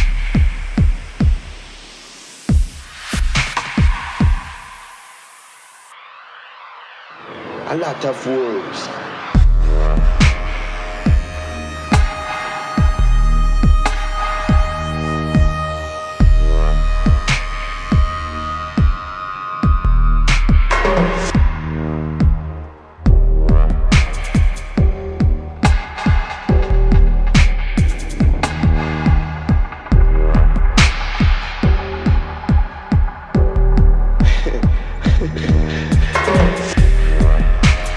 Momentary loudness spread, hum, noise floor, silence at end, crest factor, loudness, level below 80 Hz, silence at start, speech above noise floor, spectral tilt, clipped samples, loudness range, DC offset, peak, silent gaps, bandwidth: 11 LU; none; -42 dBFS; 0 s; 14 dB; -17 LUFS; -16 dBFS; 0 s; 21 dB; -6 dB/octave; under 0.1%; 5 LU; under 0.1%; 0 dBFS; none; 11 kHz